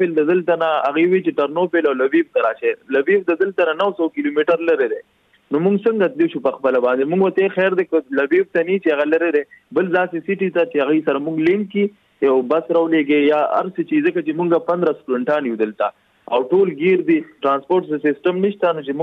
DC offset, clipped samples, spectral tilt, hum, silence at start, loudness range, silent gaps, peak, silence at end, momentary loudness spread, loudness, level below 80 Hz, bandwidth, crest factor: under 0.1%; under 0.1%; -8.5 dB/octave; none; 0 s; 1 LU; none; -4 dBFS; 0 s; 5 LU; -18 LUFS; -68 dBFS; 4.8 kHz; 14 dB